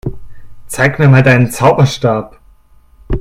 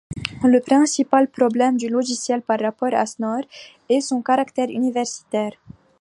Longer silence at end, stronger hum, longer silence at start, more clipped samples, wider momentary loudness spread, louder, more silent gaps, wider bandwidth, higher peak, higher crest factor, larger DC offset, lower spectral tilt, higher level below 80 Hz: second, 0 s vs 0.3 s; neither; about the same, 0.05 s vs 0.1 s; first, 0.2% vs under 0.1%; first, 16 LU vs 9 LU; first, -10 LUFS vs -20 LUFS; neither; first, 14.5 kHz vs 11.5 kHz; about the same, 0 dBFS vs 0 dBFS; second, 12 dB vs 20 dB; neither; first, -6.5 dB/octave vs -4 dB/octave; first, -30 dBFS vs -56 dBFS